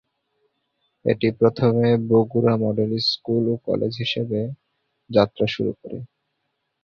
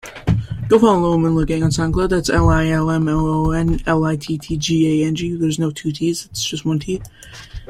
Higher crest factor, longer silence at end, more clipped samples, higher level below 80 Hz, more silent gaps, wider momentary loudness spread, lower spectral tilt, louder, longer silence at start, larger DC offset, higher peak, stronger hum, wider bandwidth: about the same, 18 dB vs 16 dB; first, 0.8 s vs 0.05 s; neither; second, -58 dBFS vs -30 dBFS; neither; about the same, 10 LU vs 8 LU; first, -8 dB/octave vs -6 dB/octave; second, -21 LUFS vs -18 LUFS; first, 1.05 s vs 0.05 s; neither; about the same, -4 dBFS vs -2 dBFS; neither; second, 6.8 kHz vs 14.5 kHz